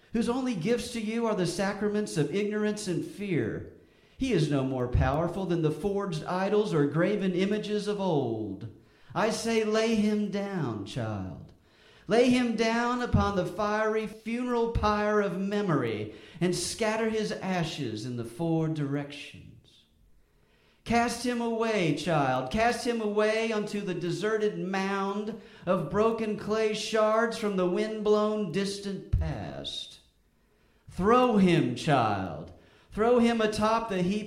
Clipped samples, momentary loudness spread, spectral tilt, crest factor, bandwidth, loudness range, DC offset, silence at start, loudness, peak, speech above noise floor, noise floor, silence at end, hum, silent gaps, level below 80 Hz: under 0.1%; 10 LU; -6 dB/octave; 18 dB; 15 kHz; 4 LU; under 0.1%; 0.1 s; -28 LUFS; -10 dBFS; 39 dB; -66 dBFS; 0 s; none; none; -46 dBFS